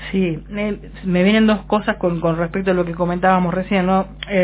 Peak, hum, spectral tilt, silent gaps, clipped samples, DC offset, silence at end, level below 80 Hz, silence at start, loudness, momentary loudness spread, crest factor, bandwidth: -2 dBFS; none; -11 dB/octave; none; under 0.1%; under 0.1%; 0 s; -38 dBFS; 0 s; -18 LUFS; 9 LU; 16 dB; 4 kHz